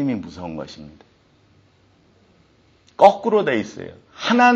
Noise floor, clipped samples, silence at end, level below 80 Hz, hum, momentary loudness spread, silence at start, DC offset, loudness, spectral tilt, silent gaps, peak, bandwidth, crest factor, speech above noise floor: -57 dBFS; under 0.1%; 0 s; -60 dBFS; none; 24 LU; 0 s; under 0.1%; -19 LUFS; -3 dB/octave; none; 0 dBFS; 8 kHz; 20 dB; 38 dB